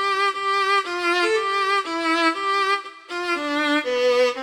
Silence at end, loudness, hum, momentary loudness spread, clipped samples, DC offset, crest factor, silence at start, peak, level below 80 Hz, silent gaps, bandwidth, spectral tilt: 0 s; -21 LUFS; none; 5 LU; under 0.1%; under 0.1%; 12 dB; 0 s; -8 dBFS; -70 dBFS; none; 17.5 kHz; -1.5 dB/octave